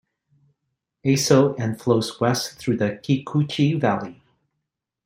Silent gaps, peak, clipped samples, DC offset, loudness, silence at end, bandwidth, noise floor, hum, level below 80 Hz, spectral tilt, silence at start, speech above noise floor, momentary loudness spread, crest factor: none; -2 dBFS; under 0.1%; under 0.1%; -22 LUFS; 0.95 s; 16 kHz; -81 dBFS; none; -60 dBFS; -5.5 dB/octave; 1.05 s; 60 dB; 8 LU; 20 dB